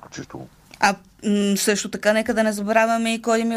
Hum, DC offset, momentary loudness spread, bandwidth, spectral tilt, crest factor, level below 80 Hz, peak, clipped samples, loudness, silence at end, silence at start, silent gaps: none; under 0.1%; 17 LU; 15.5 kHz; -4 dB/octave; 18 dB; -56 dBFS; -4 dBFS; under 0.1%; -20 LUFS; 0 s; 0.1 s; none